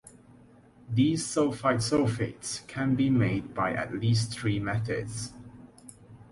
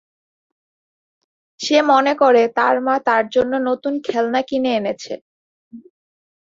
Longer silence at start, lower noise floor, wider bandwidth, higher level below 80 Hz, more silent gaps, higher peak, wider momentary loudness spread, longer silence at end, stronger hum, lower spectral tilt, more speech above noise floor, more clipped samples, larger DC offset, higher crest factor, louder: second, 0.05 s vs 1.6 s; second, -55 dBFS vs under -90 dBFS; first, 11.5 kHz vs 7.8 kHz; first, -54 dBFS vs -62 dBFS; second, none vs 5.21-5.71 s; second, -12 dBFS vs -2 dBFS; about the same, 12 LU vs 12 LU; second, 0.1 s vs 0.65 s; neither; first, -5.5 dB/octave vs -3.5 dB/octave; second, 28 dB vs over 73 dB; neither; neither; about the same, 18 dB vs 18 dB; second, -28 LUFS vs -17 LUFS